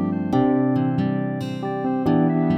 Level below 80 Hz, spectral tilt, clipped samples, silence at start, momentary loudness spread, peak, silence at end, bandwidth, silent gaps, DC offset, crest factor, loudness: -54 dBFS; -9.5 dB/octave; under 0.1%; 0 s; 7 LU; -8 dBFS; 0 s; 8 kHz; none; under 0.1%; 14 dB; -22 LUFS